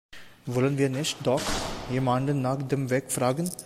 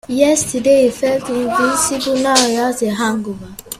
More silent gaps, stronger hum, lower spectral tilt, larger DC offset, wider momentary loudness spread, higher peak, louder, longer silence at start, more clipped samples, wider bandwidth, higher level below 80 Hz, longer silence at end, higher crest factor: neither; neither; first, -5 dB/octave vs -3 dB/octave; neither; about the same, 5 LU vs 6 LU; second, -12 dBFS vs 0 dBFS; second, -27 LUFS vs -15 LUFS; about the same, 0.1 s vs 0.1 s; neither; about the same, 16 kHz vs 16 kHz; about the same, -46 dBFS vs -48 dBFS; about the same, 0 s vs 0 s; about the same, 16 dB vs 16 dB